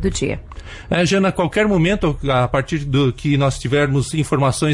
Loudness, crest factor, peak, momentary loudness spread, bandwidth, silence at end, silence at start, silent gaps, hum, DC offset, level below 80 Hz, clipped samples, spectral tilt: -18 LUFS; 12 dB; -6 dBFS; 7 LU; 11.5 kHz; 0 s; 0 s; none; none; under 0.1%; -34 dBFS; under 0.1%; -6 dB/octave